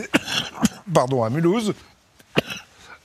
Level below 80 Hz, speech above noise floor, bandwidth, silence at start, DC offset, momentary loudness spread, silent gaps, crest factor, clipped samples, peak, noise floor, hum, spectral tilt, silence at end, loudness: -54 dBFS; 22 dB; 15 kHz; 0 s; under 0.1%; 12 LU; none; 24 dB; under 0.1%; 0 dBFS; -42 dBFS; none; -5 dB/octave; 0.1 s; -22 LUFS